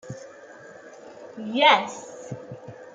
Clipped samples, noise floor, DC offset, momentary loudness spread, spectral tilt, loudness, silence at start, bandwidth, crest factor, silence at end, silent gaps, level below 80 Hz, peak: under 0.1%; -45 dBFS; under 0.1%; 27 LU; -3.5 dB/octave; -20 LUFS; 0.05 s; 9.2 kHz; 22 dB; 0.1 s; none; -74 dBFS; -6 dBFS